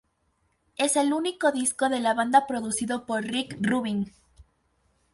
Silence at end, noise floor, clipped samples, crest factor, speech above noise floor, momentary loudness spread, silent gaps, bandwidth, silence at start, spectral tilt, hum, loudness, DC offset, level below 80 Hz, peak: 0.7 s; -71 dBFS; under 0.1%; 20 dB; 46 dB; 8 LU; none; 12 kHz; 0.8 s; -3.5 dB/octave; none; -25 LUFS; under 0.1%; -62 dBFS; -8 dBFS